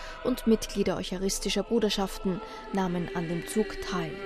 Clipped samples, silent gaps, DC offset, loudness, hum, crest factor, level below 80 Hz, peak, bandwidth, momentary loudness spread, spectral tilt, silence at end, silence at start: under 0.1%; none; under 0.1%; -30 LUFS; none; 18 dB; -44 dBFS; -12 dBFS; 14.5 kHz; 6 LU; -4.5 dB/octave; 0 s; 0 s